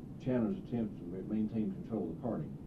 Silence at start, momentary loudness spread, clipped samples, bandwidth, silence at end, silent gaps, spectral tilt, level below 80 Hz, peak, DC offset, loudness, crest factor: 0 s; 5 LU; under 0.1%; 6 kHz; 0 s; none; -10 dB/octave; -58 dBFS; -22 dBFS; under 0.1%; -37 LUFS; 14 dB